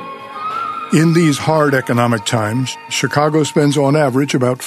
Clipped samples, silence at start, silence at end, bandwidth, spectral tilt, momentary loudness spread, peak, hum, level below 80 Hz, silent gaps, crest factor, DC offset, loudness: under 0.1%; 0 s; 0 s; 13.5 kHz; -5.5 dB/octave; 9 LU; 0 dBFS; none; -56 dBFS; none; 14 dB; under 0.1%; -15 LUFS